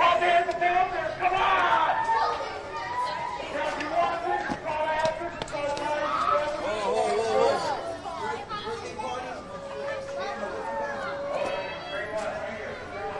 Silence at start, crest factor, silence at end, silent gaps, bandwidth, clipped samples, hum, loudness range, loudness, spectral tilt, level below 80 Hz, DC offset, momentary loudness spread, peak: 0 s; 18 dB; 0 s; none; 11.5 kHz; under 0.1%; none; 7 LU; -28 LUFS; -4 dB/octave; -54 dBFS; under 0.1%; 11 LU; -10 dBFS